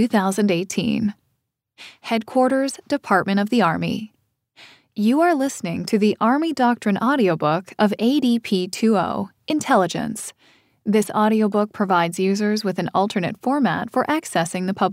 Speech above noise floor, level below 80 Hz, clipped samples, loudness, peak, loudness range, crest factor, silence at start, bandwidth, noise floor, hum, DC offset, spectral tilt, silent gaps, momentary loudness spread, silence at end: 54 dB; -64 dBFS; under 0.1%; -20 LUFS; -2 dBFS; 2 LU; 18 dB; 0 s; 16 kHz; -73 dBFS; none; under 0.1%; -5.5 dB/octave; none; 8 LU; 0 s